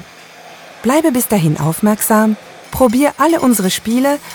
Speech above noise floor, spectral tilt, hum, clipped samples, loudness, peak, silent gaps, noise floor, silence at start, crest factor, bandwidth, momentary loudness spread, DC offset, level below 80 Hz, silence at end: 25 dB; -5 dB/octave; none; under 0.1%; -14 LUFS; 0 dBFS; none; -38 dBFS; 0.4 s; 14 dB; over 20 kHz; 4 LU; under 0.1%; -44 dBFS; 0 s